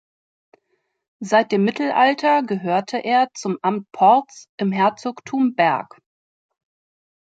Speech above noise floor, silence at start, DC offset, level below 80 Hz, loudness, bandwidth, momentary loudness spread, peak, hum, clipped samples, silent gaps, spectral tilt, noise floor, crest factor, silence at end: 52 dB; 1.2 s; under 0.1%; -72 dBFS; -19 LUFS; 9 kHz; 10 LU; -2 dBFS; none; under 0.1%; 4.49-4.58 s; -5.5 dB/octave; -71 dBFS; 18 dB; 1.5 s